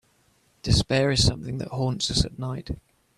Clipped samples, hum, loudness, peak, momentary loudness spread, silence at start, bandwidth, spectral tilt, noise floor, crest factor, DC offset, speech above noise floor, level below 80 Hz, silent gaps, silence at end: under 0.1%; none; -24 LUFS; -6 dBFS; 14 LU; 0.65 s; 13.5 kHz; -4.5 dB/octave; -64 dBFS; 20 dB; under 0.1%; 40 dB; -38 dBFS; none; 0.4 s